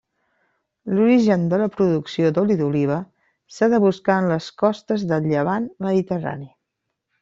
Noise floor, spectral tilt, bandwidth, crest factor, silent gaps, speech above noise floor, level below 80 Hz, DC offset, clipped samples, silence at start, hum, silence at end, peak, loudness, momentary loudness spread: -79 dBFS; -8 dB/octave; 7.8 kHz; 16 dB; none; 59 dB; -60 dBFS; under 0.1%; under 0.1%; 0.85 s; none; 0.75 s; -4 dBFS; -20 LUFS; 9 LU